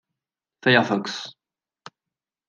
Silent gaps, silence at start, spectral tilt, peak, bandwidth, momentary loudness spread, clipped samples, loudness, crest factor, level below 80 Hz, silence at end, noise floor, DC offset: none; 0.65 s; -5 dB/octave; -2 dBFS; 9.4 kHz; 16 LU; under 0.1%; -21 LUFS; 24 dB; -76 dBFS; 1.2 s; -89 dBFS; under 0.1%